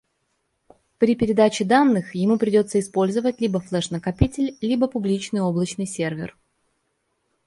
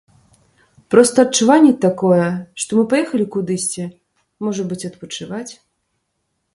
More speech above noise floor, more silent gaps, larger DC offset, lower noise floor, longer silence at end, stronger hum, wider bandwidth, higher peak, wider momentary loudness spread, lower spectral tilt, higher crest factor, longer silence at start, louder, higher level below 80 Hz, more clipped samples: second, 51 dB vs 56 dB; neither; neither; about the same, -72 dBFS vs -71 dBFS; first, 1.2 s vs 1 s; neither; about the same, 11.5 kHz vs 12 kHz; about the same, -2 dBFS vs 0 dBFS; second, 9 LU vs 17 LU; about the same, -6 dB/octave vs -5 dB/octave; about the same, 20 dB vs 18 dB; about the same, 1 s vs 0.9 s; second, -21 LUFS vs -16 LUFS; first, -42 dBFS vs -62 dBFS; neither